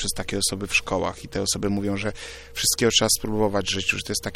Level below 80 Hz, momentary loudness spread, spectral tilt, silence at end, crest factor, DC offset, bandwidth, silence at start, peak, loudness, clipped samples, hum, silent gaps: -42 dBFS; 10 LU; -2.5 dB/octave; 0 s; 20 dB; under 0.1%; 16 kHz; 0 s; -6 dBFS; -23 LUFS; under 0.1%; none; none